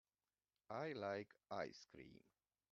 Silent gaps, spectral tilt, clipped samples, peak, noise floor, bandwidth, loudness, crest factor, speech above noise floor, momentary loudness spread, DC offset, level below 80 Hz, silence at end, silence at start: none; -4 dB/octave; under 0.1%; -32 dBFS; under -90 dBFS; 7.2 kHz; -50 LUFS; 22 dB; over 40 dB; 15 LU; under 0.1%; -86 dBFS; 0.55 s; 0.7 s